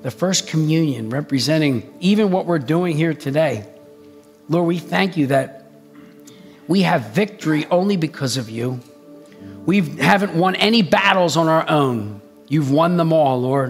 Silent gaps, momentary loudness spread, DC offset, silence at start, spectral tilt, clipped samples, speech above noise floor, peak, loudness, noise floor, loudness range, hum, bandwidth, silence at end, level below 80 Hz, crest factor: none; 9 LU; under 0.1%; 0 s; -5.5 dB/octave; under 0.1%; 28 dB; 0 dBFS; -18 LUFS; -45 dBFS; 5 LU; none; 16 kHz; 0 s; -64 dBFS; 18 dB